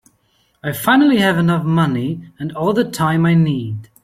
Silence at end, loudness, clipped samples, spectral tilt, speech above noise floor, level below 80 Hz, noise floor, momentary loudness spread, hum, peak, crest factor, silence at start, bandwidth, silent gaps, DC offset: 0.2 s; -16 LUFS; under 0.1%; -6.5 dB/octave; 45 dB; -52 dBFS; -60 dBFS; 14 LU; none; -2 dBFS; 14 dB; 0.65 s; 16 kHz; none; under 0.1%